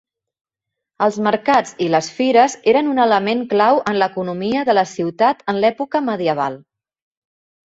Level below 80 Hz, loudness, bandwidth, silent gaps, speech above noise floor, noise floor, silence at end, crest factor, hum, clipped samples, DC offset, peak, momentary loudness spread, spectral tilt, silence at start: -62 dBFS; -17 LUFS; 8 kHz; none; 66 dB; -82 dBFS; 1.05 s; 16 dB; none; under 0.1%; under 0.1%; -2 dBFS; 6 LU; -5 dB/octave; 1 s